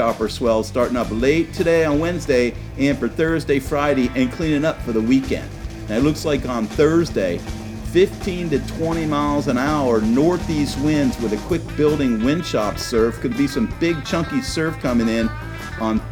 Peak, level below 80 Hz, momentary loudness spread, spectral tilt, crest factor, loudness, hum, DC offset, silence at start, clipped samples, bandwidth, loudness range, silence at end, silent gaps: -4 dBFS; -34 dBFS; 6 LU; -6 dB/octave; 16 dB; -20 LUFS; none; under 0.1%; 0 s; under 0.1%; 18 kHz; 1 LU; 0 s; none